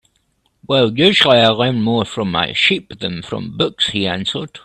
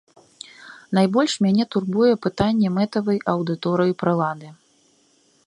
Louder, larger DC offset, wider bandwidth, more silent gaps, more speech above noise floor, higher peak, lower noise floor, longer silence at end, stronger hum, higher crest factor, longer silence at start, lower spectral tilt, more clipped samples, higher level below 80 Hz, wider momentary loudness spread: first, -15 LUFS vs -21 LUFS; neither; about the same, 12 kHz vs 11 kHz; neither; first, 47 dB vs 40 dB; first, 0 dBFS vs -4 dBFS; about the same, -63 dBFS vs -60 dBFS; second, 0.05 s vs 0.95 s; neither; about the same, 16 dB vs 18 dB; about the same, 0.7 s vs 0.6 s; second, -5 dB/octave vs -6.5 dB/octave; neither; about the same, -52 dBFS vs -56 dBFS; second, 13 LU vs 16 LU